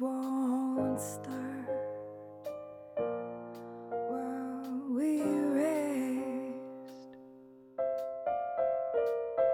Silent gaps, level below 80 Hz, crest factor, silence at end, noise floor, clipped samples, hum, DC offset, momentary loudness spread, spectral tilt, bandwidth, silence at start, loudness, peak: none; -76 dBFS; 16 dB; 0 s; -55 dBFS; under 0.1%; none; under 0.1%; 15 LU; -6 dB/octave; 18 kHz; 0 s; -35 LUFS; -18 dBFS